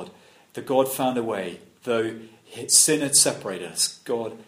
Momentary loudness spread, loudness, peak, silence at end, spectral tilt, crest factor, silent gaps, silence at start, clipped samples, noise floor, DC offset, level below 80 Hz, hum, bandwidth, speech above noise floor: 21 LU; -21 LUFS; -2 dBFS; 0.05 s; -2 dB/octave; 22 dB; none; 0 s; under 0.1%; -49 dBFS; under 0.1%; -70 dBFS; none; 15.5 kHz; 25 dB